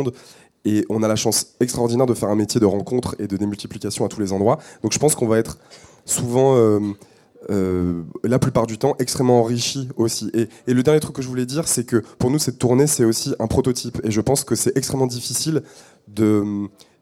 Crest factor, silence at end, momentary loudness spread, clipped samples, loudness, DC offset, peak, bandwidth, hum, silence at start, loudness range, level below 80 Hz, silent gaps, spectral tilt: 16 dB; 0.35 s; 9 LU; under 0.1%; -20 LUFS; under 0.1%; -4 dBFS; 16.5 kHz; none; 0 s; 2 LU; -50 dBFS; none; -5 dB/octave